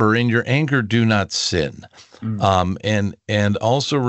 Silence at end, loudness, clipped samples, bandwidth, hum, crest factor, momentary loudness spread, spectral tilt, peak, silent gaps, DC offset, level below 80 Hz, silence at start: 0 s; -19 LUFS; under 0.1%; 8.2 kHz; none; 18 dB; 5 LU; -5.5 dB/octave; -2 dBFS; none; under 0.1%; -48 dBFS; 0 s